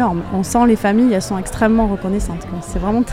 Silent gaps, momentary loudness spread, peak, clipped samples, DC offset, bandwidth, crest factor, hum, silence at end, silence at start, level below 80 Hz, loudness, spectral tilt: none; 10 LU; 0 dBFS; under 0.1%; under 0.1%; 15.5 kHz; 16 dB; none; 0 s; 0 s; -30 dBFS; -17 LUFS; -6 dB/octave